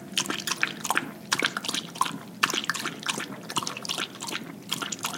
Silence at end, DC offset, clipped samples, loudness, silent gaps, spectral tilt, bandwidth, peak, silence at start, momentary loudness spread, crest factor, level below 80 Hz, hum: 0 s; under 0.1%; under 0.1%; -29 LUFS; none; -1.5 dB/octave; 17 kHz; -2 dBFS; 0 s; 6 LU; 28 dB; -74 dBFS; none